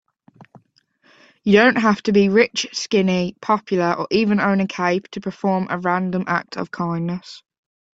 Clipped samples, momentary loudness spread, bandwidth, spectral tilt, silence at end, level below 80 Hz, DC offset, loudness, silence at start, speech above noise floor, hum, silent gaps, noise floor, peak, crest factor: under 0.1%; 11 LU; 7.8 kHz; -5.5 dB/octave; 0.6 s; -60 dBFS; under 0.1%; -19 LUFS; 0.4 s; 41 dB; none; none; -60 dBFS; -2 dBFS; 18 dB